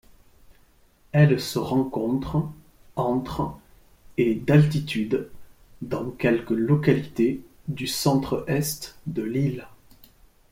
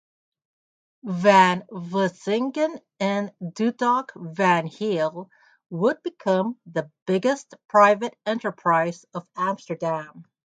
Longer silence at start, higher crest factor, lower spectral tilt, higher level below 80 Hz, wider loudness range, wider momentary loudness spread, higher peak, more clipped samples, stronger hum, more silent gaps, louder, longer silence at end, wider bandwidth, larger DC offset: second, 0.5 s vs 1.05 s; about the same, 20 dB vs 22 dB; about the same, -6.5 dB/octave vs -6 dB/octave; first, -50 dBFS vs -74 dBFS; about the same, 3 LU vs 3 LU; about the same, 13 LU vs 14 LU; second, -6 dBFS vs -2 dBFS; neither; neither; second, none vs 7.02-7.06 s, 7.65-7.69 s; about the same, -24 LUFS vs -23 LUFS; first, 0.85 s vs 0.35 s; first, 16.5 kHz vs 9.2 kHz; neither